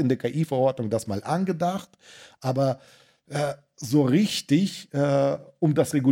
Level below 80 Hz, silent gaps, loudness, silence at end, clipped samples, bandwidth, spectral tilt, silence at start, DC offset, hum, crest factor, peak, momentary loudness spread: -66 dBFS; none; -25 LUFS; 0 s; under 0.1%; 16.5 kHz; -6.5 dB/octave; 0 s; under 0.1%; none; 16 dB; -8 dBFS; 8 LU